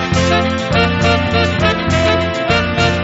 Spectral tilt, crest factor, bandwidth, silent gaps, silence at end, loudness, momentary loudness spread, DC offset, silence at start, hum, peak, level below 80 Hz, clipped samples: -4 dB/octave; 14 dB; 8 kHz; none; 0 s; -14 LUFS; 2 LU; under 0.1%; 0 s; none; 0 dBFS; -30 dBFS; under 0.1%